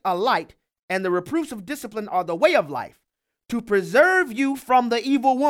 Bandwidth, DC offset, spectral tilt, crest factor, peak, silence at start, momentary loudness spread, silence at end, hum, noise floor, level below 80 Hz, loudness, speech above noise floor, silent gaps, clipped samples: 16.5 kHz; under 0.1%; -4.5 dB/octave; 18 dB; -4 dBFS; 0.05 s; 13 LU; 0 s; none; -51 dBFS; -64 dBFS; -22 LUFS; 30 dB; 0.83-0.88 s; under 0.1%